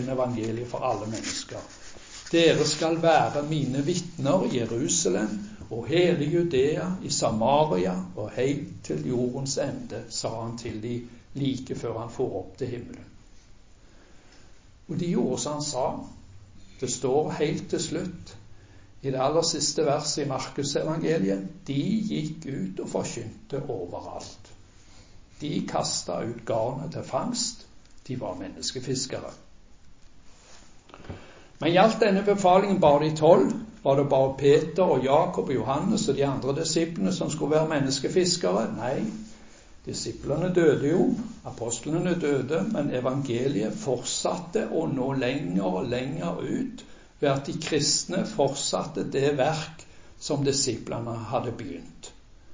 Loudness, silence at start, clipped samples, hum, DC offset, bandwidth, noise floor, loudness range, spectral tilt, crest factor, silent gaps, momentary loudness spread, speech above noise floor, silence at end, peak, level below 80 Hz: -26 LUFS; 0 s; under 0.1%; none; under 0.1%; 7.8 kHz; -52 dBFS; 11 LU; -5 dB/octave; 22 dB; none; 15 LU; 26 dB; 0 s; -4 dBFS; -54 dBFS